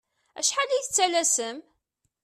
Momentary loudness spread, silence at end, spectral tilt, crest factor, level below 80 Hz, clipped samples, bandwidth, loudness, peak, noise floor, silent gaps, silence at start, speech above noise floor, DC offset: 10 LU; 0.65 s; 1 dB/octave; 18 dB; -74 dBFS; under 0.1%; 14 kHz; -24 LUFS; -10 dBFS; -77 dBFS; none; 0.35 s; 52 dB; under 0.1%